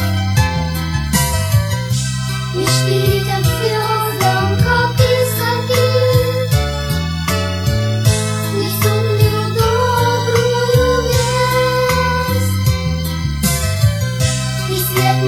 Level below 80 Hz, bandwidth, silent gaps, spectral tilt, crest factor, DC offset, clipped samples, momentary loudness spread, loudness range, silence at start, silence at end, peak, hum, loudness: -28 dBFS; 18 kHz; none; -5 dB/octave; 14 dB; under 0.1%; under 0.1%; 5 LU; 2 LU; 0 s; 0 s; 0 dBFS; none; -15 LUFS